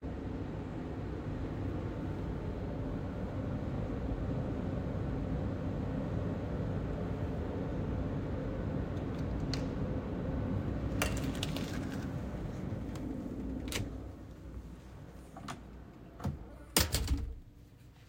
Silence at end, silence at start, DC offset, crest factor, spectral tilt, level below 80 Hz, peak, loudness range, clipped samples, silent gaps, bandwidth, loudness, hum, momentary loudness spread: 0 s; 0 s; under 0.1%; 28 dB; -5.5 dB/octave; -44 dBFS; -8 dBFS; 5 LU; under 0.1%; none; 16.5 kHz; -38 LUFS; none; 13 LU